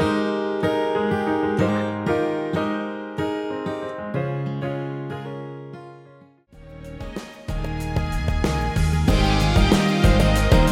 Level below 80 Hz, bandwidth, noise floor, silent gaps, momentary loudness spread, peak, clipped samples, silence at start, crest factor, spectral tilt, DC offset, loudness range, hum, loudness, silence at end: -28 dBFS; 16 kHz; -50 dBFS; none; 17 LU; -4 dBFS; under 0.1%; 0 s; 18 dB; -6 dB/octave; under 0.1%; 12 LU; none; -22 LUFS; 0 s